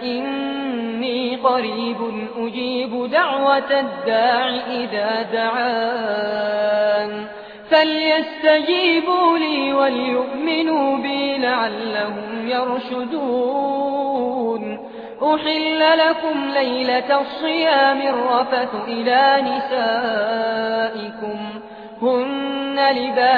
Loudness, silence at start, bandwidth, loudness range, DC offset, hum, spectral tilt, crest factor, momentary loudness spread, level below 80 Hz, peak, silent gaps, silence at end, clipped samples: -19 LUFS; 0 s; 5.2 kHz; 4 LU; under 0.1%; none; -6.5 dB/octave; 16 dB; 9 LU; -64 dBFS; -2 dBFS; none; 0 s; under 0.1%